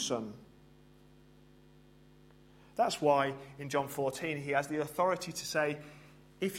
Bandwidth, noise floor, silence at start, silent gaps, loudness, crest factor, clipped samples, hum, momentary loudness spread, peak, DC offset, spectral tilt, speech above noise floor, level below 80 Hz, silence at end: 16 kHz; -60 dBFS; 0 s; none; -34 LUFS; 22 dB; under 0.1%; none; 16 LU; -14 dBFS; under 0.1%; -4 dB/octave; 27 dB; -68 dBFS; 0 s